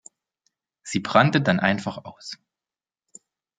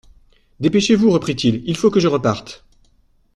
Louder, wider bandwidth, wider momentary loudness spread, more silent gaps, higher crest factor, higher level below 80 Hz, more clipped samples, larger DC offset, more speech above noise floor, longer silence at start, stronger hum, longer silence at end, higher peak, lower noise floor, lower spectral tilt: second, -21 LUFS vs -17 LUFS; second, 9.4 kHz vs 11.5 kHz; first, 21 LU vs 8 LU; neither; first, 24 dB vs 16 dB; second, -64 dBFS vs -48 dBFS; neither; neither; first, over 68 dB vs 40 dB; first, 0.85 s vs 0.6 s; neither; first, 1.25 s vs 0.8 s; about the same, -2 dBFS vs -2 dBFS; first, under -90 dBFS vs -57 dBFS; about the same, -5.5 dB/octave vs -6 dB/octave